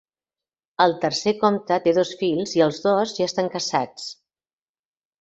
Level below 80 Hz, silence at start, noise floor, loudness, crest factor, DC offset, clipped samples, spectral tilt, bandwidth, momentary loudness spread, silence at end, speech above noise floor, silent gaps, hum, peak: -66 dBFS; 0.8 s; under -90 dBFS; -22 LUFS; 20 dB; under 0.1%; under 0.1%; -4.5 dB/octave; 8.2 kHz; 8 LU; 1.1 s; over 69 dB; none; none; -2 dBFS